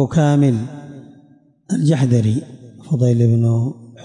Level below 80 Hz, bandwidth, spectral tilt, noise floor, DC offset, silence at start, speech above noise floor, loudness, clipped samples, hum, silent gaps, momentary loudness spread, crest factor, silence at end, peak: -54 dBFS; 10.5 kHz; -8 dB/octave; -51 dBFS; under 0.1%; 0 s; 36 dB; -17 LUFS; under 0.1%; none; none; 11 LU; 12 dB; 0 s; -6 dBFS